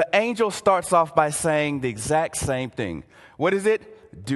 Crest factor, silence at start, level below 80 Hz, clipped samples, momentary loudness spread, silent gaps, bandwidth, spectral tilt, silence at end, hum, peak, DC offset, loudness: 20 dB; 0 s; -48 dBFS; under 0.1%; 10 LU; none; 12.5 kHz; -4.5 dB/octave; 0 s; none; -4 dBFS; under 0.1%; -23 LUFS